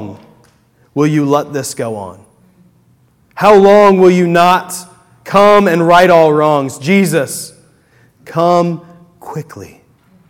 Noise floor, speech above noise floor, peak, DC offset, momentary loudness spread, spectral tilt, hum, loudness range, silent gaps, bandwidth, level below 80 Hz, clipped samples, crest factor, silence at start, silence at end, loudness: -51 dBFS; 42 dB; 0 dBFS; under 0.1%; 20 LU; -5.5 dB/octave; none; 9 LU; none; 17 kHz; -50 dBFS; 0.9%; 12 dB; 0 s; 0.65 s; -10 LUFS